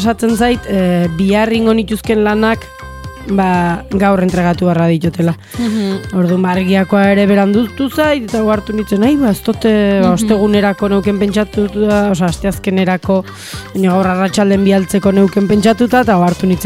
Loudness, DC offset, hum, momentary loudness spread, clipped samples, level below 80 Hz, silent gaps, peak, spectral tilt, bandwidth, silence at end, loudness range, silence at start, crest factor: -13 LUFS; under 0.1%; none; 6 LU; under 0.1%; -34 dBFS; none; 0 dBFS; -6.5 dB/octave; 15.5 kHz; 0 s; 2 LU; 0 s; 12 dB